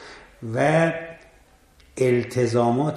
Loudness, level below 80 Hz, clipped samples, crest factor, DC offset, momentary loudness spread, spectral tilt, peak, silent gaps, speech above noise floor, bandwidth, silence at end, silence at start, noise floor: -22 LUFS; -56 dBFS; under 0.1%; 18 dB; under 0.1%; 20 LU; -6.5 dB/octave; -6 dBFS; none; 34 dB; 13 kHz; 0 s; 0 s; -55 dBFS